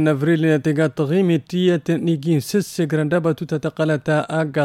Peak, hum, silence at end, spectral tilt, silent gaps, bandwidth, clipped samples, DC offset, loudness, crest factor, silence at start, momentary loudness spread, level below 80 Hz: -4 dBFS; none; 0 s; -7 dB/octave; none; 15 kHz; under 0.1%; under 0.1%; -19 LUFS; 14 dB; 0 s; 4 LU; -60 dBFS